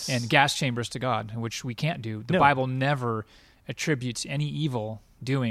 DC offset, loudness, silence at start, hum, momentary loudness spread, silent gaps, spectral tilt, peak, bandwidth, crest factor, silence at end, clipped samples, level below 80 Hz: under 0.1%; -26 LUFS; 0 s; none; 13 LU; none; -5 dB/octave; -4 dBFS; 15.5 kHz; 22 dB; 0 s; under 0.1%; -58 dBFS